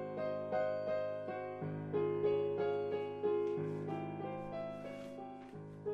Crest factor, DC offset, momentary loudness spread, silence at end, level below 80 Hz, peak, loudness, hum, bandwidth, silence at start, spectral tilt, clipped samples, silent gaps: 14 dB; under 0.1%; 12 LU; 0 s; -72 dBFS; -24 dBFS; -39 LUFS; none; 6.8 kHz; 0 s; -8.5 dB/octave; under 0.1%; none